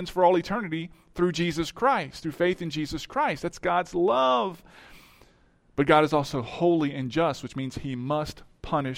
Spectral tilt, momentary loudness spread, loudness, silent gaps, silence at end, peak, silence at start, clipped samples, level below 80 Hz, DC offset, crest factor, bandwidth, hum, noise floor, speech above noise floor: -6 dB/octave; 12 LU; -26 LUFS; none; 0 s; -6 dBFS; 0 s; under 0.1%; -52 dBFS; under 0.1%; 20 dB; 16 kHz; none; -60 dBFS; 35 dB